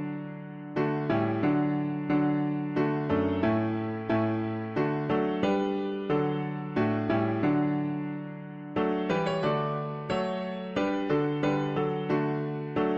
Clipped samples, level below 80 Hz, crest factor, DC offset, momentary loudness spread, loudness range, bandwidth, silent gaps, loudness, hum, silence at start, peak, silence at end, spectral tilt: under 0.1%; -60 dBFS; 14 dB; under 0.1%; 7 LU; 2 LU; 7.8 kHz; none; -29 LUFS; none; 0 s; -14 dBFS; 0 s; -8.5 dB/octave